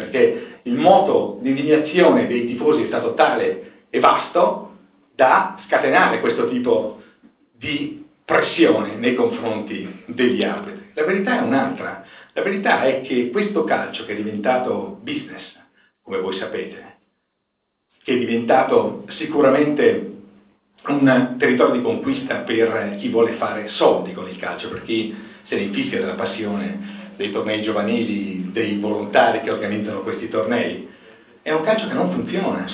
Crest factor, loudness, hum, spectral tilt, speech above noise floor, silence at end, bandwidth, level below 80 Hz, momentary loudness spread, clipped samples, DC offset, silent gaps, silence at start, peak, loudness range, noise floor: 20 dB; -19 LUFS; none; -9.5 dB/octave; 54 dB; 0 s; 4 kHz; -62 dBFS; 14 LU; under 0.1%; under 0.1%; none; 0 s; 0 dBFS; 6 LU; -73 dBFS